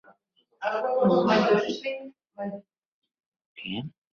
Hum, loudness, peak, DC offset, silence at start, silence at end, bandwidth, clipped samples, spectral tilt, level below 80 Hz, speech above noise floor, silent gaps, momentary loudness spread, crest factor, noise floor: none; -26 LUFS; -10 dBFS; under 0.1%; 0.6 s; 0.25 s; 7 kHz; under 0.1%; -6.5 dB/octave; -68 dBFS; 42 dB; 2.85-3.02 s, 3.26-3.32 s, 3.46-3.55 s; 18 LU; 18 dB; -67 dBFS